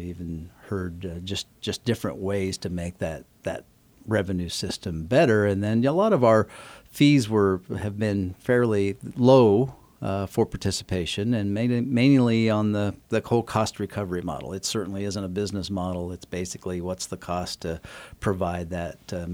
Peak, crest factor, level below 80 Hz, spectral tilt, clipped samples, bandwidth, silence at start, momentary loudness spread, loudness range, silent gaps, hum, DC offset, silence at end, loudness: -4 dBFS; 20 dB; -50 dBFS; -6 dB/octave; under 0.1%; 18.5 kHz; 0 s; 14 LU; 9 LU; none; none; under 0.1%; 0 s; -25 LUFS